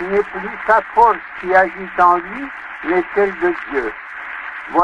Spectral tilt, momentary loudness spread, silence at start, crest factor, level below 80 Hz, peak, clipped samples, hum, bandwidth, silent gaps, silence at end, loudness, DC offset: -6.5 dB/octave; 14 LU; 0 s; 16 dB; -48 dBFS; 0 dBFS; under 0.1%; none; 10 kHz; none; 0 s; -17 LUFS; under 0.1%